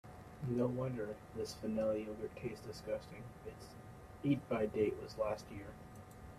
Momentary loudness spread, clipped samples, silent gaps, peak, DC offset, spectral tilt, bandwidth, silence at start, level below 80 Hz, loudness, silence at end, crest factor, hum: 18 LU; under 0.1%; none; -22 dBFS; under 0.1%; -7 dB/octave; 14.5 kHz; 0.05 s; -62 dBFS; -40 LUFS; 0 s; 18 dB; none